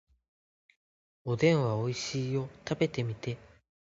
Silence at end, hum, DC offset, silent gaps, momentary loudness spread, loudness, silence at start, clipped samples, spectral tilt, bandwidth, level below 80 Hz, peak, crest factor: 0.5 s; none; under 0.1%; none; 13 LU; -31 LUFS; 1.25 s; under 0.1%; -6 dB/octave; 8 kHz; -64 dBFS; -12 dBFS; 22 dB